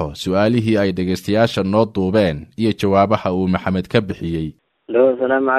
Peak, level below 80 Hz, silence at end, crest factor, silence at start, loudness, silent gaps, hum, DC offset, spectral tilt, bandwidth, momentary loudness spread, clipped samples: 0 dBFS; -44 dBFS; 0 s; 16 dB; 0 s; -18 LUFS; none; none; under 0.1%; -7 dB/octave; 14.5 kHz; 6 LU; under 0.1%